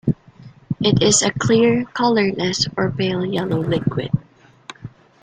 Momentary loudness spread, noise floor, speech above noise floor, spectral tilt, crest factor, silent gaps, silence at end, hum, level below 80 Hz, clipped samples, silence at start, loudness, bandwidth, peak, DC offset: 15 LU; -44 dBFS; 26 dB; -4.5 dB/octave; 16 dB; none; 0.35 s; none; -48 dBFS; under 0.1%; 0.05 s; -18 LUFS; 9.6 kHz; -4 dBFS; under 0.1%